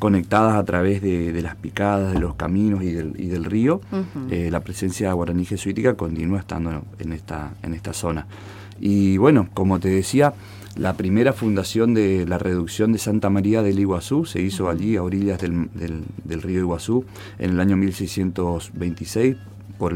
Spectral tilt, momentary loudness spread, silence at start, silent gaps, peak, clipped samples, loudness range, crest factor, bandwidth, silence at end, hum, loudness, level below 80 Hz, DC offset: -7 dB/octave; 12 LU; 0 s; none; -4 dBFS; under 0.1%; 5 LU; 18 dB; 16.5 kHz; 0 s; none; -22 LUFS; -42 dBFS; under 0.1%